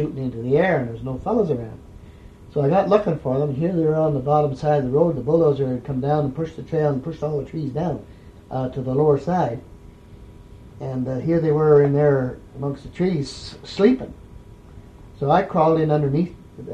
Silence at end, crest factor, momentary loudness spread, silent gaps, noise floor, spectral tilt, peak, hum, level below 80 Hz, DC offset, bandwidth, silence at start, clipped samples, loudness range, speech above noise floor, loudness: 0 s; 20 dB; 12 LU; none; -43 dBFS; -8.5 dB/octave; -2 dBFS; none; -46 dBFS; under 0.1%; 9 kHz; 0 s; under 0.1%; 5 LU; 23 dB; -21 LUFS